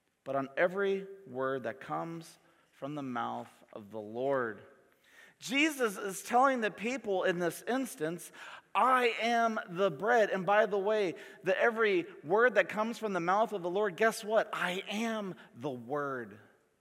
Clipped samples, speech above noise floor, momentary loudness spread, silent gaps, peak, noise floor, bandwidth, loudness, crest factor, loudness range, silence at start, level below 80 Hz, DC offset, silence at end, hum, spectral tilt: under 0.1%; 30 dB; 15 LU; none; -12 dBFS; -62 dBFS; 16.5 kHz; -32 LUFS; 22 dB; 9 LU; 0.25 s; -86 dBFS; under 0.1%; 0.4 s; none; -4.5 dB/octave